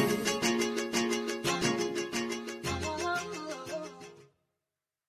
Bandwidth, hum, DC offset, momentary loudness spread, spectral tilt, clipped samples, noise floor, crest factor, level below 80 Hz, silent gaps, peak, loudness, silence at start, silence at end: 16 kHz; none; under 0.1%; 11 LU; -3.5 dB/octave; under 0.1%; -90 dBFS; 20 dB; -56 dBFS; none; -14 dBFS; -32 LUFS; 0 s; 0.85 s